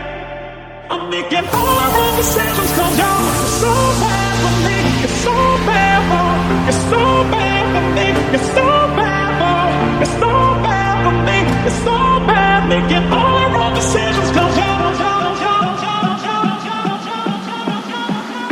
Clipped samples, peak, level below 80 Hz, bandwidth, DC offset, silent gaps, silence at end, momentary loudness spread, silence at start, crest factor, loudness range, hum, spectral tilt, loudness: under 0.1%; 0 dBFS; -30 dBFS; 19 kHz; under 0.1%; none; 0 s; 8 LU; 0 s; 14 dB; 3 LU; none; -4.5 dB/octave; -14 LUFS